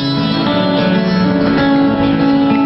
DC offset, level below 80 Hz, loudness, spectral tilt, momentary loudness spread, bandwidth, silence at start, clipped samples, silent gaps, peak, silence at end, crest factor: under 0.1%; -38 dBFS; -13 LUFS; -8 dB/octave; 2 LU; 6 kHz; 0 s; under 0.1%; none; -2 dBFS; 0 s; 10 dB